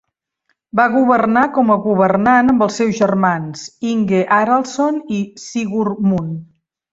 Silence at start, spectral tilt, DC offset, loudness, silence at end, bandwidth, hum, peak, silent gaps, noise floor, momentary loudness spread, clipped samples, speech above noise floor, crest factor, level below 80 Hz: 0.75 s; -6.5 dB/octave; under 0.1%; -15 LUFS; 0.5 s; 8 kHz; none; -2 dBFS; none; -68 dBFS; 11 LU; under 0.1%; 53 dB; 14 dB; -54 dBFS